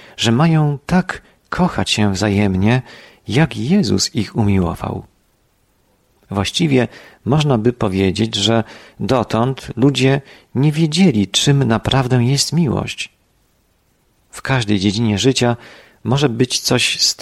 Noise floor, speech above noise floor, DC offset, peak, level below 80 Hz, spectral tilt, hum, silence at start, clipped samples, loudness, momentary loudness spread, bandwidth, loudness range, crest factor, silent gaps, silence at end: -59 dBFS; 44 dB; under 0.1%; -2 dBFS; -42 dBFS; -5 dB/octave; none; 0.2 s; under 0.1%; -16 LUFS; 12 LU; 13.5 kHz; 4 LU; 16 dB; none; 0 s